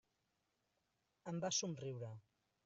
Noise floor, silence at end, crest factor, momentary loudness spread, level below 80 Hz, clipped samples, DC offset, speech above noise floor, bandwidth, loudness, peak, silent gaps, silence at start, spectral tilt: -86 dBFS; 0.45 s; 22 dB; 16 LU; -86 dBFS; under 0.1%; under 0.1%; 41 dB; 8 kHz; -44 LUFS; -26 dBFS; none; 1.25 s; -4.5 dB/octave